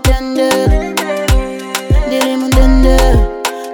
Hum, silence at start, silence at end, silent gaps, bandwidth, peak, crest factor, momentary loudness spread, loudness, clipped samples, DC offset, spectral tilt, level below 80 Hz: none; 0 s; 0 s; none; 18.5 kHz; 0 dBFS; 10 dB; 7 LU; -13 LUFS; under 0.1%; under 0.1%; -5.5 dB/octave; -14 dBFS